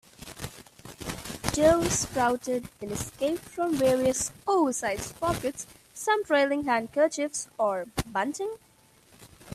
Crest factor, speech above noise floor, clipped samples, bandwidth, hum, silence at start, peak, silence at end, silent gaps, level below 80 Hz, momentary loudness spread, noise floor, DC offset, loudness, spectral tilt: 24 dB; 32 dB; under 0.1%; 15.5 kHz; none; 0.2 s; -4 dBFS; 0 s; none; -52 dBFS; 16 LU; -59 dBFS; under 0.1%; -27 LUFS; -4 dB/octave